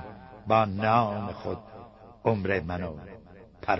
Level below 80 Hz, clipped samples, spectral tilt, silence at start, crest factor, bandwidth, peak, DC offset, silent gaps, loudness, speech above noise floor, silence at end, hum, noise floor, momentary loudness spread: -54 dBFS; under 0.1%; -8.5 dB/octave; 0 s; 20 dB; 6 kHz; -8 dBFS; under 0.1%; none; -28 LUFS; 21 dB; 0 s; none; -48 dBFS; 23 LU